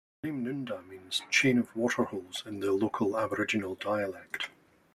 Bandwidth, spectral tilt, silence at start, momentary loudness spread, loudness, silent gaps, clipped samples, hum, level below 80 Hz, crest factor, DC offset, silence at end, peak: 15 kHz; -4 dB/octave; 0.25 s; 12 LU; -31 LUFS; none; under 0.1%; none; -68 dBFS; 20 dB; under 0.1%; 0.45 s; -12 dBFS